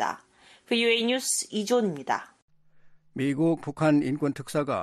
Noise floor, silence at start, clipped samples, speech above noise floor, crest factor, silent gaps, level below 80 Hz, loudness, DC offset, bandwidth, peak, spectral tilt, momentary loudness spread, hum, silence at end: -57 dBFS; 0 s; under 0.1%; 31 dB; 16 dB; 2.42-2.48 s; -68 dBFS; -26 LUFS; under 0.1%; 13.5 kHz; -10 dBFS; -4 dB/octave; 8 LU; none; 0 s